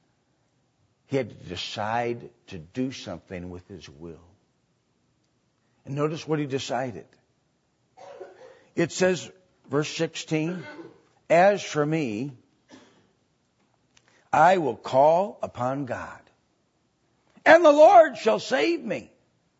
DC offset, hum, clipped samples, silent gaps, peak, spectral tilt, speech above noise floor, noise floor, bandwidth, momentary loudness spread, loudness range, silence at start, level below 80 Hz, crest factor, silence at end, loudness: under 0.1%; none; under 0.1%; none; -2 dBFS; -5 dB/octave; 47 dB; -70 dBFS; 8 kHz; 25 LU; 14 LU; 1.1 s; -66 dBFS; 24 dB; 0.55 s; -23 LUFS